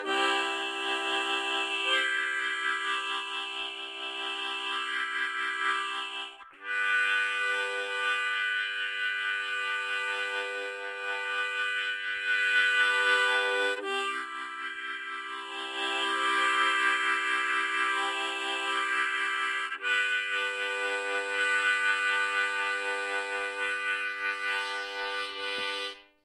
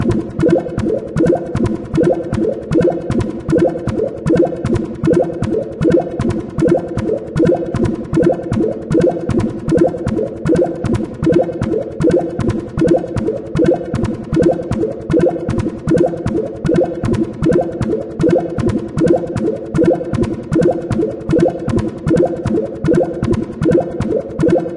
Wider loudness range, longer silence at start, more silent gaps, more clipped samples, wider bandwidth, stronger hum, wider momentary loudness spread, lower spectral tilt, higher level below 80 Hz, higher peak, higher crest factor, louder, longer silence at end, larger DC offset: first, 4 LU vs 1 LU; about the same, 0 s vs 0 s; neither; neither; first, 13 kHz vs 11 kHz; neither; first, 9 LU vs 5 LU; second, 1 dB/octave vs -8.5 dB/octave; second, -82 dBFS vs -34 dBFS; second, -12 dBFS vs -2 dBFS; about the same, 18 dB vs 14 dB; second, -28 LUFS vs -16 LUFS; first, 0.2 s vs 0 s; neither